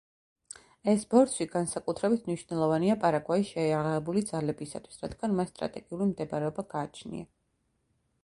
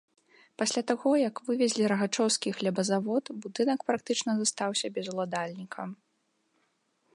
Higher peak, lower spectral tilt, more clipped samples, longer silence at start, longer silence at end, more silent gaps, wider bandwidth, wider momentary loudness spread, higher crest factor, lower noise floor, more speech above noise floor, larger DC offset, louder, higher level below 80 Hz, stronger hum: about the same, -10 dBFS vs -10 dBFS; first, -6 dB/octave vs -3.5 dB/octave; neither; first, 0.85 s vs 0.6 s; second, 1 s vs 1.2 s; neither; about the same, 11.5 kHz vs 11.5 kHz; first, 16 LU vs 10 LU; about the same, 22 dB vs 20 dB; about the same, -75 dBFS vs -75 dBFS; about the same, 46 dB vs 46 dB; neither; about the same, -30 LUFS vs -29 LUFS; first, -62 dBFS vs -82 dBFS; neither